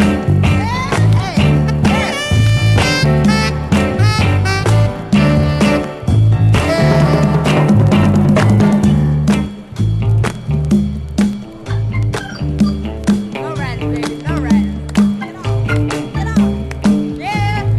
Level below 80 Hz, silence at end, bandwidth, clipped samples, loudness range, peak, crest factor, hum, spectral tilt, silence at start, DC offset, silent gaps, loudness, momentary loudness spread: -26 dBFS; 0 s; 12.5 kHz; under 0.1%; 6 LU; 0 dBFS; 12 dB; none; -6.5 dB/octave; 0 s; under 0.1%; none; -14 LUFS; 8 LU